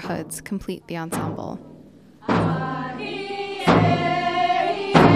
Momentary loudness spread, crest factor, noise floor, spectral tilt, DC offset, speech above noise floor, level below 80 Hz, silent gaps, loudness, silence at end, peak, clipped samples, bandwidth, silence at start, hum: 13 LU; 20 dB; -47 dBFS; -6 dB/octave; 0.1%; 18 dB; -46 dBFS; none; -23 LUFS; 0 s; -2 dBFS; under 0.1%; 15.5 kHz; 0 s; none